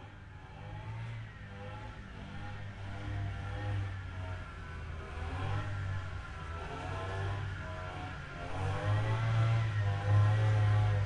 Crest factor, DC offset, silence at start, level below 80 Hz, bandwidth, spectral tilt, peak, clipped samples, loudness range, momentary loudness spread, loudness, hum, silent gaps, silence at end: 16 dB; under 0.1%; 0 s; -48 dBFS; 9.4 kHz; -7 dB/octave; -18 dBFS; under 0.1%; 10 LU; 17 LU; -36 LUFS; none; none; 0 s